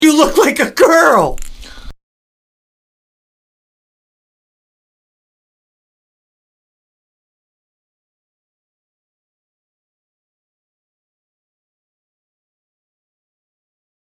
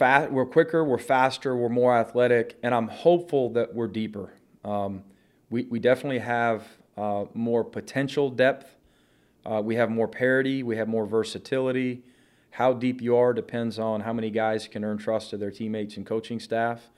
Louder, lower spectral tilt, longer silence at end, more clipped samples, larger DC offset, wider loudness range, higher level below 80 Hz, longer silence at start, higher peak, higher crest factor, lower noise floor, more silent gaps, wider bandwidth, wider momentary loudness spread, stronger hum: first, -10 LUFS vs -26 LUFS; second, -3.5 dB/octave vs -6.5 dB/octave; first, 12.1 s vs 0.15 s; neither; neither; first, 8 LU vs 5 LU; first, -40 dBFS vs -70 dBFS; about the same, 0 s vs 0 s; about the same, 0 dBFS vs -2 dBFS; about the same, 20 dB vs 22 dB; second, -31 dBFS vs -62 dBFS; neither; first, 15.5 kHz vs 12.5 kHz; about the same, 9 LU vs 11 LU; neither